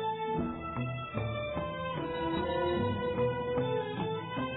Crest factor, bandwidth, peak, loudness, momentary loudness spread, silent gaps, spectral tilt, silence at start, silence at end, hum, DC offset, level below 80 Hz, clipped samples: 14 dB; 4.1 kHz; -20 dBFS; -34 LUFS; 5 LU; none; -5 dB/octave; 0 s; 0 s; none; under 0.1%; -52 dBFS; under 0.1%